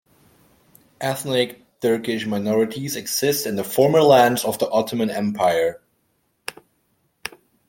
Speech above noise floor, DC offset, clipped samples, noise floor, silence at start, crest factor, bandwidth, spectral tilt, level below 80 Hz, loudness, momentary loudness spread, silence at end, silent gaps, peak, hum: 49 dB; under 0.1%; under 0.1%; -68 dBFS; 1 s; 20 dB; 17 kHz; -4.5 dB/octave; -64 dBFS; -20 LUFS; 20 LU; 0.4 s; none; -2 dBFS; none